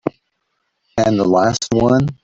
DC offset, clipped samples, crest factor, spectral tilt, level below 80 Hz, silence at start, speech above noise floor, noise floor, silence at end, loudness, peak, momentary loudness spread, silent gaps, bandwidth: under 0.1%; under 0.1%; 14 dB; -6 dB/octave; -44 dBFS; 0.05 s; 55 dB; -70 dBFS; 0.1 s; -16 LUFS; -2 dBFS; 10 LU; none; 8 kHz